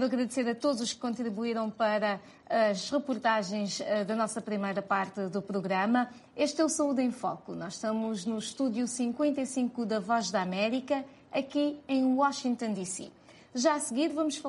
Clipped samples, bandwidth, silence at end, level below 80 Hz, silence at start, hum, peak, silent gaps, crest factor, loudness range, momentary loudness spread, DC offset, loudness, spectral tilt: under 0.1%; 11.5 kHz; 0 s; -74 dBFS; 0 s; none; -14 dBFS; none; 18 dB; 1 LU; 7 LU; under 0.1%; -31 LUFS; -4 dB/octave